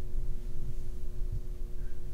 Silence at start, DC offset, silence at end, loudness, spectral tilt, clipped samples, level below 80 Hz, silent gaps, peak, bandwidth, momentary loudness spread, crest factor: 0 s; under 0.1%; 0 s; -43 LUFS; -7.5 dB/octave; under 0.1%; -34 dBFS; none; -20 dBFS; 1.7 kHz; 3 LU; 8 dB